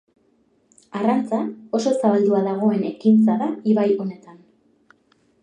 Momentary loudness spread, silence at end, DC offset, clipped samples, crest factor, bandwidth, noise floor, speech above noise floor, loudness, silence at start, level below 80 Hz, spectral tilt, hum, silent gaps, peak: 9 LU; 1.1 s; under 0.1%; under 0.1%; 16 dB; 9.6 kHz; -62 dBFS; 43 dB; -20 LUFS; 0.95 s; -74 dBFS; -7.5 dB/octave; none; none; -4 dBFS